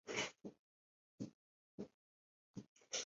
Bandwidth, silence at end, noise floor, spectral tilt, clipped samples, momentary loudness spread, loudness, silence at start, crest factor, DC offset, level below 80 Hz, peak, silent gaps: 7.6 kHz; 0 s; under -90 dBFS; -2 dB/octave; under 0.1%; 15 LU; -51 LUFS; 0.05 s; 24 dB; under 0.1%; -82 dBFS; -28 dBFS; 0.59-1.18 s, 1.34-1.78 s, 1.94-2.54 s, 2.68-2.76 s